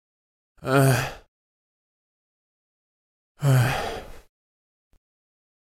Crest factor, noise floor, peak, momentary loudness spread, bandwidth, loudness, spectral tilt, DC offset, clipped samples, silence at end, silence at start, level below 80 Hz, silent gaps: 20 dB; under -90 dBFS; -6 dBFS; 15 LU; 16.5 kHz; -23 LUFS; -6 dB/octave; under 0.1%; under 0.1%; 1.55 s; 0.6 s; -50 dBFS; 1.28-3.35 s